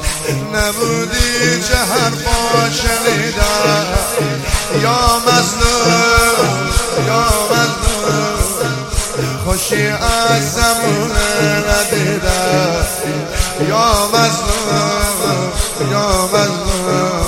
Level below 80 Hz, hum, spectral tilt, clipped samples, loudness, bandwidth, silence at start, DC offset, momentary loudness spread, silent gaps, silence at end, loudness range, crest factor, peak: -24 dBFS; none; -3.5 dB/octave; under 0.1%; -14 LUFS; 17 kHz; 0 s; under 0.1%; 6 LU; none; 0 s; 2 LU; 14 dB; 0 dBFS